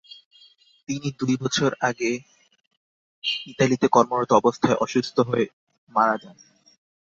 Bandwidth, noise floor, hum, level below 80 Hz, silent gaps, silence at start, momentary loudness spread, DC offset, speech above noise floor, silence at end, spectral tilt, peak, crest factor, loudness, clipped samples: 7.6 kHz; -55 dBFS; none; -62 dBFS; 2.67-2.71 s, 2.77-3.22 s, 5.53-5.67 s, 5.78-5.87 s; 0.9 s; 11 LU; under 0.1%; 33 dB; 0.7 s; -5 dB/octave; -2 dBFS; 22 dB; -23 LUFS; under 0.1%